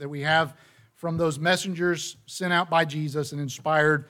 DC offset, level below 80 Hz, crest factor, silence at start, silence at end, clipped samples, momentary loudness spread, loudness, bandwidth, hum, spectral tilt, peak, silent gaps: under 0.1%; -64 dBFS; 18 dB; 0 s; 0.05 s; under 0.1%; 10 LU; -25 LUFS; 17 kHz; none; -4.5 dB/octave; -8 dBFS; none